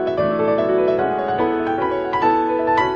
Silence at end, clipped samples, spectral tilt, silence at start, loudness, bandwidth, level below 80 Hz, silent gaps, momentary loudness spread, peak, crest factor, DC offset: 0 s; under 0.1%; -7.5 dB/octave; 0 s; -19 LUFS; 7 kHz; -48 dBFS; none; 3 LU; -6 dBFS; 12 dB; under 0.1%